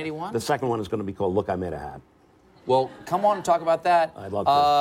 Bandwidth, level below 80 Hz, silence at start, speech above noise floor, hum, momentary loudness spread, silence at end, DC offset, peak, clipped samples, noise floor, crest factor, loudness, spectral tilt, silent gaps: 16 kHz; -56 dBFS; 0 s; 32 dB; none; 10 LU; 0 s; under 0.1%; -8 dBFS; under 0.1%; -55 dBFS; 16 dB; -24 LUFS; -5.5 dB/octave; none